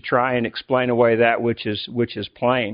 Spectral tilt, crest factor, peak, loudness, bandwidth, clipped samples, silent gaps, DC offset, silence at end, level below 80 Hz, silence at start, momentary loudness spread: -4 dB/octave; 18 dB; -2 dBFS; -20 LUFS; 5.2 kHz; under 0.1%; none; under 0.1%; 0 s; -58 dBFS; 0.05 s; 9 LU